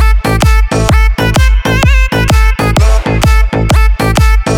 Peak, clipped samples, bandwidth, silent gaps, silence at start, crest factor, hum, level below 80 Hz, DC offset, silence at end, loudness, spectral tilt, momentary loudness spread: 0 dBFS; under 0.1%; 16 kHz; none; 0 s; 8 dB; none; -10 dBFS; under 0.1%; 0 s; -10 LUFS; -5.5 dB/octave; 1 LU